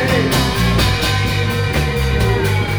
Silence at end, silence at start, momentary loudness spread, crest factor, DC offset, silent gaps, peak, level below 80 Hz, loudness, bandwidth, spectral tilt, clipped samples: 0 s; 0 s; 3 LU; 12 dB; under 0.1%; none; -4 dBFS; -24 dBFS; -16 LUFS; over 20 kHz; -5 dB/octave; under 0.1%